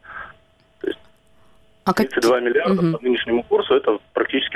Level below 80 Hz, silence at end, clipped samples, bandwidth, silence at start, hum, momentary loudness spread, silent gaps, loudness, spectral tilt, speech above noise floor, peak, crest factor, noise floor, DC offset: -54 dBFS; 0 s; under 0.1%; 16 kHz; 0.1 s; none; 16 LU; none; -20 LUFS; -5.5 dB/octave; 38 dB; -4 dBFS; 18 dB; -57 dBFS; under 0.1%